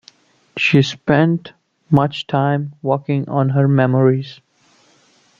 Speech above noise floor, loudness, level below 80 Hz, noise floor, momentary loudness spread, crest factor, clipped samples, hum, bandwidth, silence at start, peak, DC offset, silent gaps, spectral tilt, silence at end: 39 dB; -17 LUFS; -54 dBFS; -55 dBFS; 8 LU; 16 dB; under 0.1%; none; 7.4 kHz; 0.55 s; -2 dBFS; under 0.1%; none; -7.5 dB/octave; 1.05 s